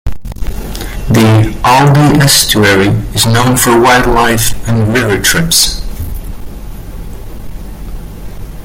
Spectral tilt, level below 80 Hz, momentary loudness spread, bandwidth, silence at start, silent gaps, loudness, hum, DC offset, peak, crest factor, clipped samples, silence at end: -4 dB/octave; -22 dBFS; 22 LU; over 20 kHz; 0.05 s; none; -8 LUFS; none; under 0.1%; 0 dBFS; 10 dB; under 0.1%; 0 s